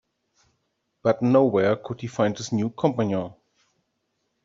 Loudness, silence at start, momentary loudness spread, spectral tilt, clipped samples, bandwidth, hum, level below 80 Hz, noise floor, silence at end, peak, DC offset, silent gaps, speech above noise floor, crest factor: -23 LUFS; 1.05 s; 10 LU; -6.5 dB/octave; under 0.1%; 7.8 kHz; none; -66 dBFS; -75 dBFS; 1.1 s; -6 dBFS; under 0.1%; none; 53 dB; 20 dB